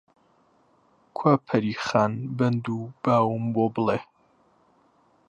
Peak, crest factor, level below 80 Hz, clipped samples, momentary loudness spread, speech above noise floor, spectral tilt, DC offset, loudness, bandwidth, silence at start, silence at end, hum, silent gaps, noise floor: -6 dBFS; 20 dB; -64 dBFS; under 0.1%; 7 LU; 39 dB; -7.5 dB/octave; under 0.1%; -25 LUFS; 8.4 kHz; 1.15 s; 1.25 s; none; none; -63 dBFS